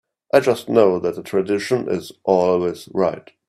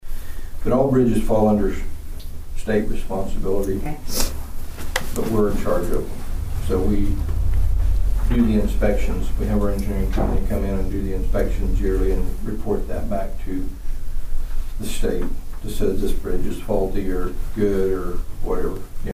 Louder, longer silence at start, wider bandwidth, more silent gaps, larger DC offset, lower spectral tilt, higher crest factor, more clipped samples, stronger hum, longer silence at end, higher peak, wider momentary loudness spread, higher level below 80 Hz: first, -19 LUFS vs -24 LUFS; first, 0.35 s vs 0.05 s; about the same, 14.5 kHz vs 15.5 kHz; neither; neither; about the same, -6 dB/octave vs -6.5 dB/octave; about the same, 18 dB vs 14 dB; neither; neither; first, 0.3 s vs 0 s; first, 0 dBFS vs -4 dBFS; second, 7 LU vs 14 LU; second, -60 dBFS vs -22 dBFS